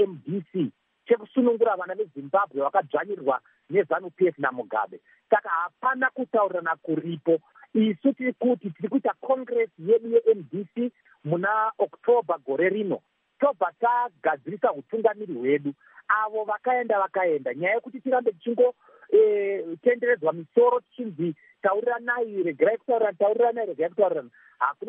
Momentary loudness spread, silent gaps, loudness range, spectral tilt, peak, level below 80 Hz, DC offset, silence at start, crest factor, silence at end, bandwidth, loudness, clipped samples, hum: 8 LU; none; 2 LU; -5 dB/octave; -6 dBFS; -86 dBFS; under 0.1%; 0 s; 20 dB; 0 s; 3.7 kHz; -25 LUFS; under 0.1%; none